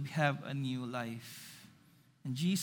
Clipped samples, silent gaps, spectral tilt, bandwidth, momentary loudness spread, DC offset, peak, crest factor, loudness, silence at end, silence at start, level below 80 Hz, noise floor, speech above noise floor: under 0.1%; none; -5.5 dB/octave; over 20 kHz; 16 LU; under 0.1%; -16 dBFS; 22 dB; -38 LUFS; 0 s; 0 s; -80 dBFS; -65 dBFS; 29 dB